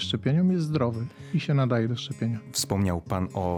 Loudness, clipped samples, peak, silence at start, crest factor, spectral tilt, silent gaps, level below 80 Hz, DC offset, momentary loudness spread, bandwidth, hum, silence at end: -27 LUFS; under 0.1%; -12 dBFS; 0 s; 14 dB; -6 dB/octave; none; -58 dBFS; under 0.1%; 7 LU; 16 kHz; none; 0 s